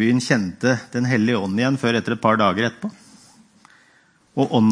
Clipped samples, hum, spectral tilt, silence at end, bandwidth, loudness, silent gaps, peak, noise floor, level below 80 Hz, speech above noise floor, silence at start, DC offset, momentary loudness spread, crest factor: under 0.1%; none; -6 dB/octave; 0 s; 10.5 kHz; -20 LUFS; none; -2 dBFS; -57 dBFS; -62 dBFS; 38 dB; 0 s; under 0.1%; 7 LU; 18 dB